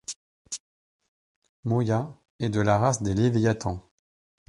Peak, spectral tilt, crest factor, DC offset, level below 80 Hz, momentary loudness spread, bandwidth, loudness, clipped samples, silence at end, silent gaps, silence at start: -6 dBFS; -6 dB/octave; 20 dB; under 0.1%; -50 dBFS; 16 LU; 11.5 kHz; -25 LUFS; under 0.1%; 0.7 s; 0.16-0.45 s, 0.60-1.00 s, 1.08-1.42 s, 1.49-1.63 s, 2.30-2.39 s; 0.1 s